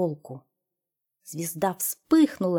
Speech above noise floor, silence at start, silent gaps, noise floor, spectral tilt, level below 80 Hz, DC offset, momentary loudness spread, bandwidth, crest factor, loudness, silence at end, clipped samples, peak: 60 dB; 0 s; none; -86 dBFS; -5.5 dB/octave; -68 dBFS; under 0.1%; 21 LU; 18.5 kHz; 18 dB; -25 LUFS; 0 s; under 0.1%; -10 dBFS